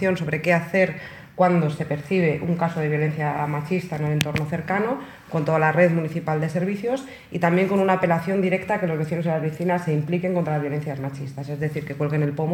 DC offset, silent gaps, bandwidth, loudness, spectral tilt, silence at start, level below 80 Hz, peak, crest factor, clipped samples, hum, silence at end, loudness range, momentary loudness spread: under 0.1%; none; 17 kHz; -23 LUFS; -7.5 dB/octave; 0 s; -58 dBFS; 0 dBFS; 22 dB; under 0.1%; none; 0 s; 3 LU; 9 LU